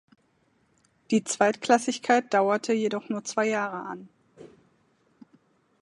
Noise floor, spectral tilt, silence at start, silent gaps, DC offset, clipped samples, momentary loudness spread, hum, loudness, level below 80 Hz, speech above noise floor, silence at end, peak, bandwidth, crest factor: -68 dBFS; -4 dB/octave; 1.1 s; none; under 0.1%; under 0.1%; 10 LU; none; -25 LUFS; -78 dBFS; 42 dB; 1.35 s; -6 dBFS; 11.5 kHz; 22 dB